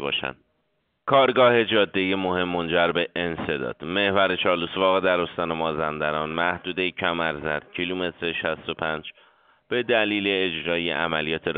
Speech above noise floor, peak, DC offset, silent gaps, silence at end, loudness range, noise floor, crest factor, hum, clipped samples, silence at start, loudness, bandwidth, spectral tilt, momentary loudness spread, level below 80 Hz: 49 dB; -4 dBFS; under 0.1%; none; 0 s; 5 LU; -72 dBFS; 20 dB; none; under 0.1%; 0 s; -23 LUFS; 4.7 kHz; -2 dB/octave; 9 LU; -56 dBFS